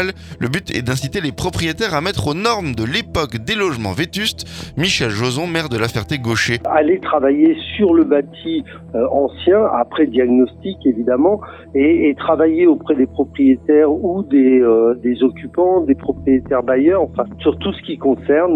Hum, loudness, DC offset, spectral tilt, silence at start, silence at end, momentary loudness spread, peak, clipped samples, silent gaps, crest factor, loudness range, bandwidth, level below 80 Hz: none; -16 LUFS; under 0.1%; -5.5 dB/octave; 0 s; 0 s; 8 LU; 0 dBFS; under 0.1%; none; 16 dB; 5 LU; 15 kHz; -42 dBFS